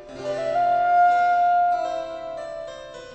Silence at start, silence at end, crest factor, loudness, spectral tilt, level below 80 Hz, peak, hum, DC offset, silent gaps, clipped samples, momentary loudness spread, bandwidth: 0 s; 0 s; 12 dB; -21 LUFS; -4.5 dB/octave; -56 dBFS; -10 dBFS; none; under 0.1%; none; under 0.1%; 17 LU; 8.2 kHz